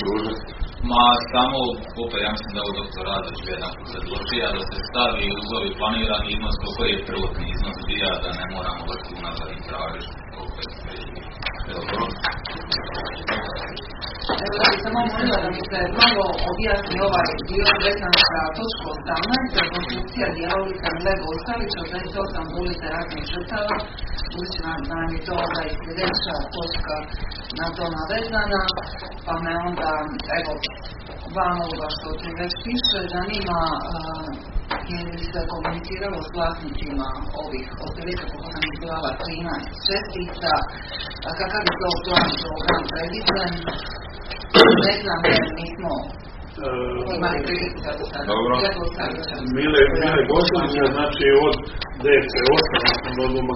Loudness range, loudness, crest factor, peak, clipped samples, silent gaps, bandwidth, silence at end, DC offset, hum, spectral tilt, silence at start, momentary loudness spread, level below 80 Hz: 10 LU; -22 LUFS; 22 dB; 0 dBFS; under 0.1%; none; 6 kHz; 0 s; under 0.1%; none; -2 dB/octave; 0 s; 14 LU; -34 dBFS